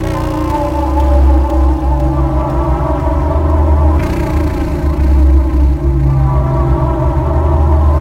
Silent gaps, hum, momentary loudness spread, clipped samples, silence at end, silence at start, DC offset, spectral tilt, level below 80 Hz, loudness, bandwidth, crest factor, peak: none; none; 4 LU; under 0.1%; 0 s; 0 s; under 0.1%; -9 dB/octave; -12 dBFS; -13 LUFS; 6.8 kHz; 10 dB; 0 dBFS